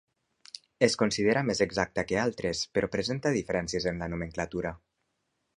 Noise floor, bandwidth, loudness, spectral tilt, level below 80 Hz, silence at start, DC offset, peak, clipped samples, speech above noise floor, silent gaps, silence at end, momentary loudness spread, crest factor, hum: -79 dBFS; 11 kHz; -29 LUFS; -4.5 dB/octave; -54 dBFS; 0.8 s; under 0.1%; -6 dBFS; under 0.1%; 50 dB; none; 0.8 s; 9 LU; 24 dB; none